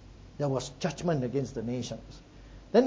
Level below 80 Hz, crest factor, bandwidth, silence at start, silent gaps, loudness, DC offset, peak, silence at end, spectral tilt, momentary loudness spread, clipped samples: -54 dBFS; 20 dB; 8 kHz; 0 s; none; -32 LUFS; under 0.1%; -10 dBFS; 0 s; -6.5 dB/octave; 21 LU; under 0.1%